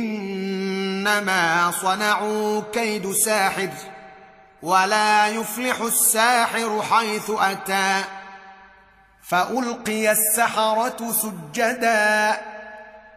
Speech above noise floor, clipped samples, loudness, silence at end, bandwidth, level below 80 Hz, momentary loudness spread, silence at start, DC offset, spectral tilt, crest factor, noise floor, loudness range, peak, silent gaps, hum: 32 dB; under 0.1%; -20 LUFS; 0.1 s; 15.5 kHz; -66 dBFS; 10 LU; 0 s; under 0.1%; -2 dB/octave; 18 dB; -53 dBFS; 4 LU; -4 dBFS; none; none